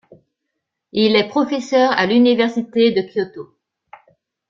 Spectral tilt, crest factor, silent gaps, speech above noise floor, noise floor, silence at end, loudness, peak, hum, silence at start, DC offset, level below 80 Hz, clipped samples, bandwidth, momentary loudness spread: -5.5 dB/octave; 16 dB; none; 61 dB; -77 dBFS; 1.05 s; -16 LUFS; -2 dBFS; none; 0.95 s; under 0.1%; -62 dBFS; under 0.1%; 7.4 kHz; 11 LU